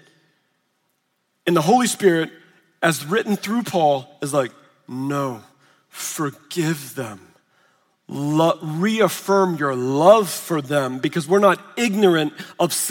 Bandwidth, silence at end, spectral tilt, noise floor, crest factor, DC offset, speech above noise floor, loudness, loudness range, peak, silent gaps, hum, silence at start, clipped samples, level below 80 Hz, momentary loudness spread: 17 kHz; 0 s; -4.5 dB/octave; -70 dBFS; 20 dB; under 0.1%; 51 dB; -20 LUFS; 9 LU; 0 dBFS; none; none; 1.45 s; under 0.1%; -72 dBFS; 13 LU